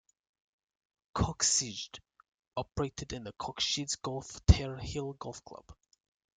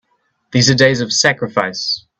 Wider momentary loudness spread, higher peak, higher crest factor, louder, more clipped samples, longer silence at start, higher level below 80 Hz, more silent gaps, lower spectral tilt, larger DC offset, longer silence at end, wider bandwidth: first, 17 LU vs 8 LU; second, -8 dBFS vs 0 dBFS; first, 28 dB vs 16 dB; second, -33 LUFS vs -14 LUFS; neither; first, 1.15 s vs 0.55 s; first, -42 dBFS vs -50 dBFS; first, 2.34-2.38 s vs none; about the same, -3.5 dB/octave vs -3.5 dB/octave; neither; first, 0.65 s vs 0.2 s; first, 9.6 kHz vs 8.4 kHz